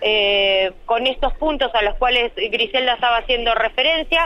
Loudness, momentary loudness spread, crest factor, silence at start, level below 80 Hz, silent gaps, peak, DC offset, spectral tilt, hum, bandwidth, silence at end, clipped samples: -18 LUFS; 5 LU; 12 dB; 0 s; -34 dBFS; none; -6 dBFS; under 0.1%; -4 dB/octave; none; 9.8 kHz; 0 s; under 0.1%